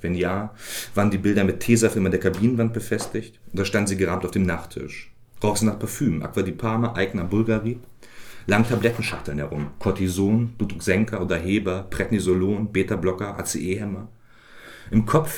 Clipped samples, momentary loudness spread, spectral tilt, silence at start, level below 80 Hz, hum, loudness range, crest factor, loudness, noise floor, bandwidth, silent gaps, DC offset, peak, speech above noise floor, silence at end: under 0.1%; 10 LU; -6 dB/octave; 0 s; -46 dBFS; none; 3 LU; 20 dB; -23 LUFS; -46 dBFS; 19 kHz; none; under 0.1%; -4 dBFS; 24 dB; 0 s